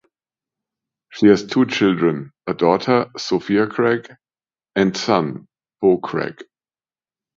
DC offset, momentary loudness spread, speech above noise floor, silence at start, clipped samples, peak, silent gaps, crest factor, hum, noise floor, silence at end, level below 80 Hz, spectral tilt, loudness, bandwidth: under 0.1%; 12 LU; over 72 dB; 1.15 s; under 0.1%; 0 dBFS; none; 20 dB; none; under -90 dBFS; 0.95 s; -58 dBFS; -6 dB/octave; -19 LUFS; 7.6 kHz